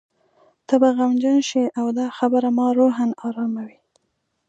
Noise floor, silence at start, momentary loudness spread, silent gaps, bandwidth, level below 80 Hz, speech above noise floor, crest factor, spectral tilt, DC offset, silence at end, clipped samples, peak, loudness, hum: -73 dBFS; 0.7 s; 9 LU; none; 8 kHz; -78 dBFS; 54 dB; 18 dB; -5 dB/octave; under 0.1%; 0.8 s; under 0.1%; -4 dBFS; -20 LUFS; none